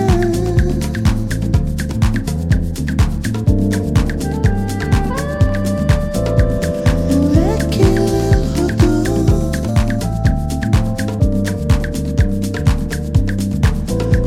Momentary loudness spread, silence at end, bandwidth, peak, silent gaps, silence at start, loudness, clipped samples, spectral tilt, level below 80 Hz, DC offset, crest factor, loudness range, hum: 5 LU; 0 s; 15.5 kHz; 0 dBFS; none; 0 s; -16 LUFS; under 0.1%; -7 dB/octave; -20 dBFS; under 0.1%; 14 dB; 3 LU; none